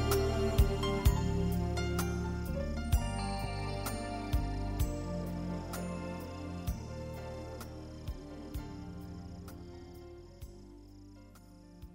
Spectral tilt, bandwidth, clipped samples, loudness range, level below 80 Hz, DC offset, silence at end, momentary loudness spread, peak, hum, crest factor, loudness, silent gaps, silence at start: -6 dB/octave; 16 kHz; under 0.1%; 14 LU; -40 dBFS; under 0.1%; 0 s; 21 LU; -14 dBFS; none; 22 dB; -36 LUFS; none; 0 s